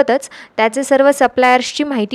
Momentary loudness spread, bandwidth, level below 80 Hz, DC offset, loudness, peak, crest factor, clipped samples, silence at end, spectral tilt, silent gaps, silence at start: 8 LU; 14 kHz; -56 dBFS; under 0.1%; -14 LUFS; 0 dBFS; 14 dB; under 0.1%; 0 s; -3 dB/octave; none; 0 s